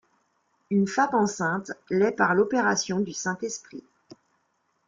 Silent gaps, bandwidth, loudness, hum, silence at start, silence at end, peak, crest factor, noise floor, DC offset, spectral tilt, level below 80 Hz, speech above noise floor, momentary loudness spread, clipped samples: none; 7.6 kHz; -25 LUFS; none; 0.7 s; 1.1 s; -8 dBFS; 20 dB; -72 dBFS; under 0.1%; -4.5 dB/octave; -68 dBFS; 47 dB; 11 LU; under 0.1%